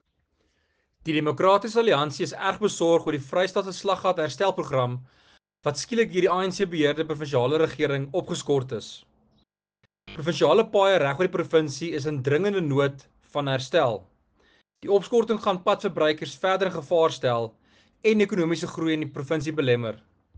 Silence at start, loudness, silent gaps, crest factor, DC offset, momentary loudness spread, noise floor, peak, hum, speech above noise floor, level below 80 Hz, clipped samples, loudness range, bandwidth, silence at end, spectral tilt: 1.05 s; -24 LUFS; none; 18 dB; under 0.1%; 9 LU; -71 dBFS; -6 dBFS; none; 48 dB; -64 dBFS; under 0.1%; 3 LU; 9.8 kHz; 0.4 s; -5.5 dB/octave